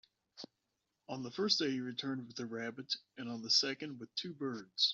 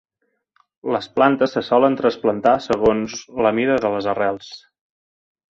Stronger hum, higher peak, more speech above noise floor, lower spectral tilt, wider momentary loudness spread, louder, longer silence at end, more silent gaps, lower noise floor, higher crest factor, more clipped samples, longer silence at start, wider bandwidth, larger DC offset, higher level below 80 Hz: neither; second, -16 dBFS vs -2 dBFS; second, 47 dB vs 54 dB; second, -2 dB/octave vs -5.5 dB/octave; first, 16 LU vs 9 LU; second, -37 LUFS vs -19 LUFS; second, 0 s vs 0.9 s; neither; first, -86 dBFS vs -72 dBFS; first, 24 dB vs 18 dB; neither; second, 0.35 s vs 0.85 s; about the same, 7.8 kHz vs 7.6 kHz; neither; second, -84 dBFS vs -54 dBFS